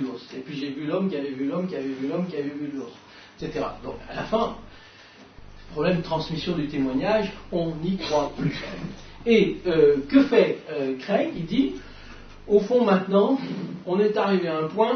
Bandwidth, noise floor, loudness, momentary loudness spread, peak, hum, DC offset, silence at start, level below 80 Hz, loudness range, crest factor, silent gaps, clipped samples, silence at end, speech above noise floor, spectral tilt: 6.6 kHz; -49 dBFS; -24 LUFS; 16 LU; -6 dBFS; none; under 0.1%; 0 s; -48 dBFS; 8 LU; 18 dB; none; under 0.1%; 0 s; 25 dB; -7 dB/octave